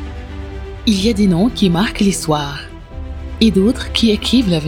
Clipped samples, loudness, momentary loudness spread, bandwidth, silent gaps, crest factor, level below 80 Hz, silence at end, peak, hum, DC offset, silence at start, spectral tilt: under 0.1%; -15 LUFS; 16 LU; 17 kHz; none; 16 dB; -30 dBFS; 0 s; 0 dBFS; none; under 0.1%; 0 s; -5.5 dB/octave